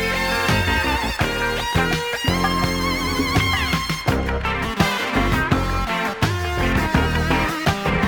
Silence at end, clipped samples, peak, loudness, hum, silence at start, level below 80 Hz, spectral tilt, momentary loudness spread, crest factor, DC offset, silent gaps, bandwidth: 0 s; under 0.1%; -2 dBFS; -20 LUFS; none; 0 s; -30 dBFS; -4.5 dB/octave; 3 LU; 18 dB; under 0.1%; none; over 20 kHz